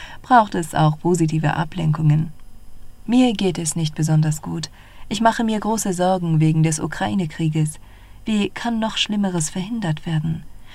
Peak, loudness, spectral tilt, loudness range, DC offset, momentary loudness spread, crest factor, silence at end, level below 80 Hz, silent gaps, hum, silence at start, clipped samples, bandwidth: -2 dBFS; -20 LUFS; -5.5 dB/octave; 3 LU; under 0.1%; 10 LU; 18 dB; 0 s; -44 dBFS; none; none; 0 s; under 0.1%; 13.5 kHz